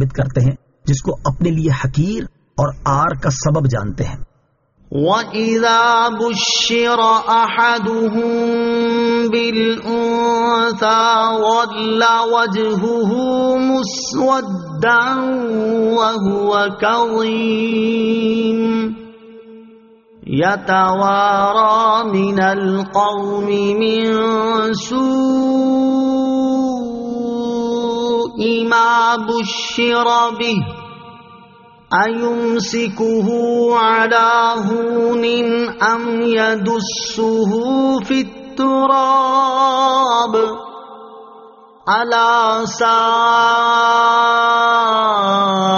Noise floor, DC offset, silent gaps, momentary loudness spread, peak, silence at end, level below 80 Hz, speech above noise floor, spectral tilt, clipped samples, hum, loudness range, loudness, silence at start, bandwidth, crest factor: -59 dBFS; under 0.1%; none; 7 LU; -2 dBFS; 0 s; -44 dBFS; 45 dB; -3.5 dB/octave; under 0.1%; none; 4 LU; -15 LUFS; 0 s; 7.2 kHz; 14 dB